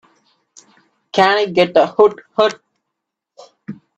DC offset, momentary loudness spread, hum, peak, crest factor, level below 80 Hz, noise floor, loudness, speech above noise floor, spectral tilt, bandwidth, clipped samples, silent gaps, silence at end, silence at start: under 0.1%; 22 LU; none; 0 dBFS; 18 dB; -64 dBFS; -79 dBFS; -15 LUFS; 65 dB; -5 dB/octave; 8.2 kHz; under 0.1%; none; 0.25 s; 1.15 s